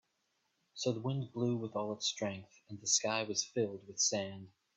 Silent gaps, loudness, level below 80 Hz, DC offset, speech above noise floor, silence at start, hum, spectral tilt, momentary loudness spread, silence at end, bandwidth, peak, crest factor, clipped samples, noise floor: none; -35 LUFS; -80 dBFS; under 0.1%; 44 dB; 0.75 s; none; -3 dB/octave; 14 LU; 0.3 s; 8.4 kHz; -16 dBFS; 20 dB; under 0.1%; -81 dBFS